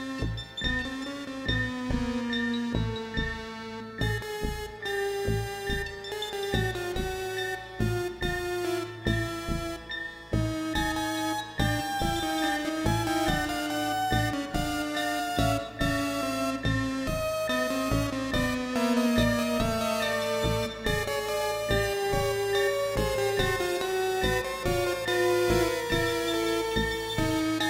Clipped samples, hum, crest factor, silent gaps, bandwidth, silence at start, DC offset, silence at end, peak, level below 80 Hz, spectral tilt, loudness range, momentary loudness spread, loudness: under 0.1%; none; 18 dB; none; 16 kHz; 0 s; under 0.1%; 0 s; -12 dBFS; -40 dBFS; -4.5 dB/octave; 4 LU; 6 LU; -29 LUFS